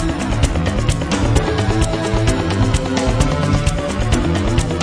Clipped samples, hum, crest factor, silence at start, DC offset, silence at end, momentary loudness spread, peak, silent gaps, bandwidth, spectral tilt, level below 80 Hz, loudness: under 0.1%; none; 14 dB; 0 s; 0.3%; 0 s; 2 LU; -2 dBFS; none; 10.5 kHz; -5.5 dB/octave; -22 dBFS; -17 LUFS